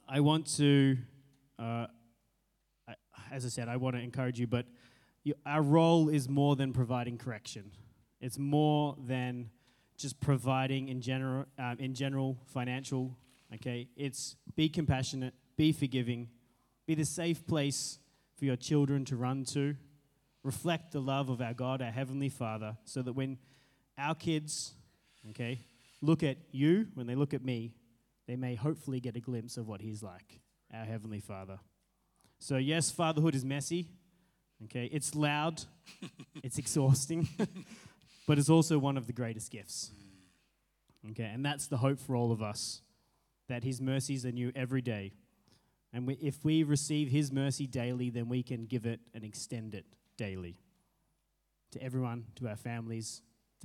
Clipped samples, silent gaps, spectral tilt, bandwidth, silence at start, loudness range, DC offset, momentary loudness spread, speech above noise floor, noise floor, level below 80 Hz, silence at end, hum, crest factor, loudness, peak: under 0.1%; none; -5.5 dB/octave; 15 kHz; 0.1 s; 9 LU; under 0.1%; 17 LU; 46 dB; -79 dBFS; -68 dBFS; 0 s; none; 22 dB; -34 LUFS; -12 dBFS